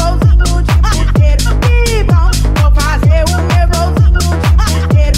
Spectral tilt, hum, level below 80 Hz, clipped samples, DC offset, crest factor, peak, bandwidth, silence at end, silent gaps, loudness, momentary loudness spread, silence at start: -5.5 dB/octave; none; -10 dBFS; under 0.1%; under 0.1%; 8 dB; 0 dBFS; 15 kHz; 0 s; none; -11 LUFS; 1 LU; 0 s